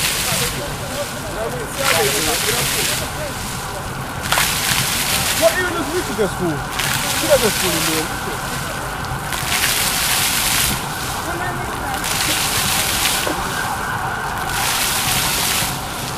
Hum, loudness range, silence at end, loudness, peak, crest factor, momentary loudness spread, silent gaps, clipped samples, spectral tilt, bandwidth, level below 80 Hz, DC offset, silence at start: none; 1 LU; 0 s; -18 LUFS; 0 dBFS; 20 dB; 9 LU; none; under 0.1%; -2 dB/octave; 16 kHz; -36 dBFS; under 0.1%; 0 s